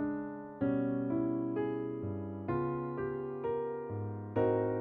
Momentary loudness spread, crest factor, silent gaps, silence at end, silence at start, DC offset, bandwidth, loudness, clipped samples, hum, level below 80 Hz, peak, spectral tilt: 8 LU; 16 dB; none; 0 s; 0 s; under 0.1%; 4.2 kHz; -36 LUFS; under 0.1%; none; -64 dBFS; -18 dBFS; -9 dB/octave